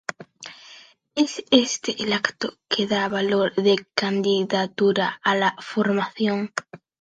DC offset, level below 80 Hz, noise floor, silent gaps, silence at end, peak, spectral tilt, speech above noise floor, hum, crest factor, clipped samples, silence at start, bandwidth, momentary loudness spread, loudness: under 0.1%; -68 dBFS; -49 dBFS; none; 0.25 s; -2 dBFS; -4 dB/octave; 27 dB; none; 22 dB; under 0.1%; 0.1 s; 9.4 kHz; 13 LU; -22 LUFS